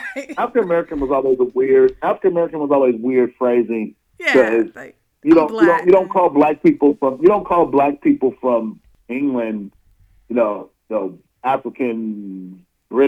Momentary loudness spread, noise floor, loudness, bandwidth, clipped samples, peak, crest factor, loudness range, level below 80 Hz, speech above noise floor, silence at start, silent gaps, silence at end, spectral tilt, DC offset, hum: 13 LU; -53 dBFS; -17 LUFS; 8 kHz; under 0.1%; -2 dBFS; 14 dB; 8 LU; -52 dBFS; 37 dB; 0 s; none; 0 s; -7.5 dB/octave; under 0.1%; none